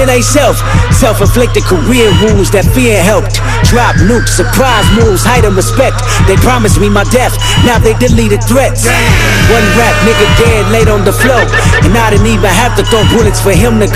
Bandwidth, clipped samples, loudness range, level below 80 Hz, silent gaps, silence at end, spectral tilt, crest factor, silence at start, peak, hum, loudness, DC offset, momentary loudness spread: 15.5 kHz; 0.8%; 1 LU; -14 dBFS; none; 0 s; -5 dB/octave; 6 dB; 0 s; 0 dBFS; none; -7 LUFS; under 0.1%; 2 LU